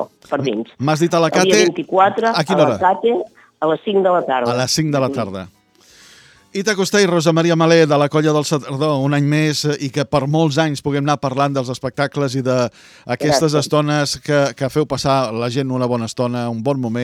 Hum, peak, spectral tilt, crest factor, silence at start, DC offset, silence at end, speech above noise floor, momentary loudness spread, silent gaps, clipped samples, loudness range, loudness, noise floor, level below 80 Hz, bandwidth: none; 0 dBFS; -5 dB/octave; 16 dB; 0 s; under 0.1%; 0 s; 33 dB; 8 LU; none; under 0.1%; 3 LU; -17 LUFS; -49 dBFS; -54 dBFS; 15 kHz